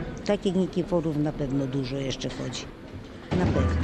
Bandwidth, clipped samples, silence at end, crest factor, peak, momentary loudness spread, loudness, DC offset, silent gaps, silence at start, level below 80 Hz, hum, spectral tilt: 11 kHz; under 0.1%; 0 s; 18 dB; -10 dBFS; 14 LU; -28 LUFS; under 0.1%; none; 0 s; -40 dBFS; none; -6.5 dB/octave